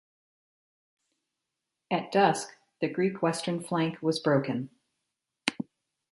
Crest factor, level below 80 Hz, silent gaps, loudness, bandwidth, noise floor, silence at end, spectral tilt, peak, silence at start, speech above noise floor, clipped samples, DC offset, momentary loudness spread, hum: 26 dB; -76 dBFS; none; -29 LUFS; 11.5 kHz; -86 dBFS; 0.5 s; -5 dB/octave; -6 dBFS; 1.9 s; 58 dB; under 0.1%; under 0.1%; 13 LU; none